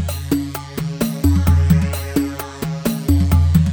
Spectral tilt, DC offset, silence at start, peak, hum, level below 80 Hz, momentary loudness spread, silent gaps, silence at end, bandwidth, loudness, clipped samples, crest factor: -7 dB/octave; under 0.1%; 0 s; -2 dBFS; none; -24 dBFS; 11 LU; none; 0 s; over 20 kHz; -18 LUFS; under 0.1%; 14 dB